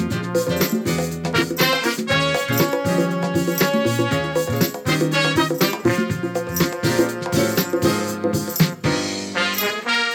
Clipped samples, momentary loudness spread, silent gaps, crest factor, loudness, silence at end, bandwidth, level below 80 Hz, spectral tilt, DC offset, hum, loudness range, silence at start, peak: under 0.1%; 4 LU; none; 16 dB; -20 LUFS; 0 s; 18.5 kHz; -50 dBFS; -4.5 dB/octave; under 0.1%; none; 1 LU; 0 s; -4 dBFS